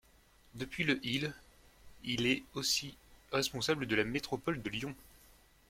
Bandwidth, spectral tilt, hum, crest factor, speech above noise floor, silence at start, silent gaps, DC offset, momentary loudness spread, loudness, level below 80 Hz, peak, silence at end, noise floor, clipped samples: 16.5 kHz; -3.5 dB/octave; none; 22 dB; 29 dB; 0.55 s; none; under 0.1%; 13 LU; -35 LUFS; -62 dBFS; -16 dBFS; 0.65 s; -65 dBFS; under 0.1%